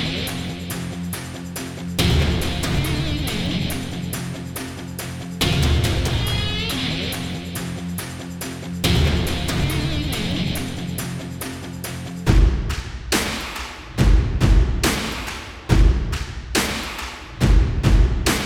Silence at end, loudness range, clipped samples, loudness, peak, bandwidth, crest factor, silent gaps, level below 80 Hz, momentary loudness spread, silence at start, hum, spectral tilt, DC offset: 0 s; 3 LU; under 0.1%; -22 LUFS; -2 dBFS; 17.5 kHz; 18 dB; none; -24 dBFS; 12 LU; 0 s; none; -4.5 dB/octave; under 0.1%